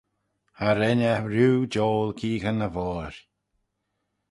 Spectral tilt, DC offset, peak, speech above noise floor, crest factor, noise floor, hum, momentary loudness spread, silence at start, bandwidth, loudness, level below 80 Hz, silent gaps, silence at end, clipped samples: -7 dB/octave; under 0.1%; -8 dBFS; 54 dB; 18 dB; -78 dBFS; none; 9 LU; 0.6 s; 11.5 kHz; -25 LUFS; -50 dBFS; none; 1.1 s; under 0.1%